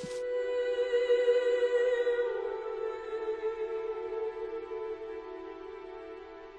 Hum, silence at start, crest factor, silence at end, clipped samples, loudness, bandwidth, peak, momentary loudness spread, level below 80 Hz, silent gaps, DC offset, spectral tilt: none; 0 s; 16 dB; 0 s; under 0.1%; -32 LUFS; 9.6 kHz; -16 dBFS; 17 LU; -64 dBFS; none; under 0.1%; -4 dB/octave